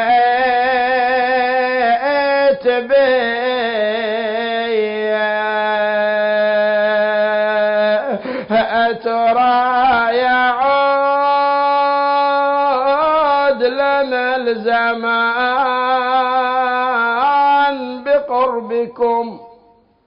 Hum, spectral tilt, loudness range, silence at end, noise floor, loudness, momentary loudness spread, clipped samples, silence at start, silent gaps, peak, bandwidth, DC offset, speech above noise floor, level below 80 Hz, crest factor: none; -8.5 dB/octave; 2 LU; 0.6 s; -51 dBFS; -15 LUFS; 4 LU; under 0.1%; 0 s; none; -6 dBFS; 5.4 kHz; under 0.1%; 36 dB; -56 dBFS; 10 dB